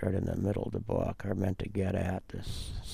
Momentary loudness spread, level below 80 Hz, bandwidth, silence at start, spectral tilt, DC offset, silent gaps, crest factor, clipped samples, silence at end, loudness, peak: 8 LU; -46 dBFS; 14 kHz; 0 s; -7.5 dB/octave; under 0.1%; none; 18 dB; under 0.1%; 0 s; -34 LUFS; -16 dBFS